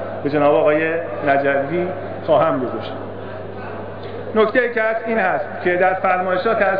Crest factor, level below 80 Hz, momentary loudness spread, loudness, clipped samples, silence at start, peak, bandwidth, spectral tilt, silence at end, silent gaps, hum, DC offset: 14 dB; -58 dBFS; 14 LU; -18 LUFS; under 0.1%; 0 s; -4 dBFS; 5.2 kHz; -9.5 dB/octave; 0 s; none; none; 1%